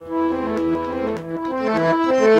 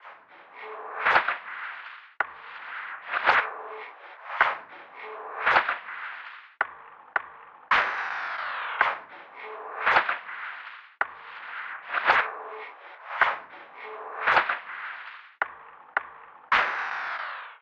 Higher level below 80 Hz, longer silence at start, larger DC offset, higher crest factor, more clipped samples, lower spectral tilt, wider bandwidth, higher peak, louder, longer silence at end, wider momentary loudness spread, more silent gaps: first, -50 dBFS vs -68 dBFS; about the same, 0 s vs 0 s; neither; second, 16 dB vs 24 dB; neither; first, -6.5 dB/octave vs -2.5 dB/octave; first, 9 kHz vs 8 kHz; about the same, -4 dBFS vs -6 dBFS; first, -21 LUFS vs -27 LUFS; about the same, 0 s vs 0.05 s; second, 8 LU vs 20 LU; neither